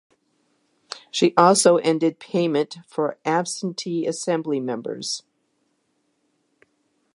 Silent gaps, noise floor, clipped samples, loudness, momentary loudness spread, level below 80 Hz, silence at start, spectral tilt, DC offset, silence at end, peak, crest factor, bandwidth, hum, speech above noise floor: none; -70 dBFS; under 0.1%; -22 LUFS; 13 LU; -76 dBFS; 0.95 s; -4 dB/octave; under 0.1%; 1.95 s; 0 dBFS; 22 dB; 11.5 kHz; none; 49 dB